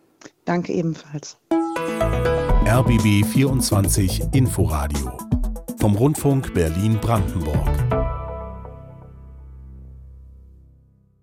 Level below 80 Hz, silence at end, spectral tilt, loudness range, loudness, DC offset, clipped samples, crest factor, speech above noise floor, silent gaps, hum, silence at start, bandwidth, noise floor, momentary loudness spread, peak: -28 dBFS; 0.9 s; -6 dB/octave; 9 LU; -21 LUFS; under 0.1%; under 0.1%; 14 dB; 35 dB; none; none; 0.25 s; 17 kHz; -54 dBFS; 17 LU; -6 dBFS